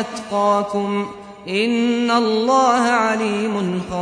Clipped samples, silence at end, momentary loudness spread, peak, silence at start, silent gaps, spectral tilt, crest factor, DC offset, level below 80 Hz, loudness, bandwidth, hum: under 0.1%; 0 s; 9 LU; -4 dBFS; 0 s; none; -5 dB/octave; 16 dB; under 0.1%; -54 dBFS; -18 LUFS; 10.5 kHz; none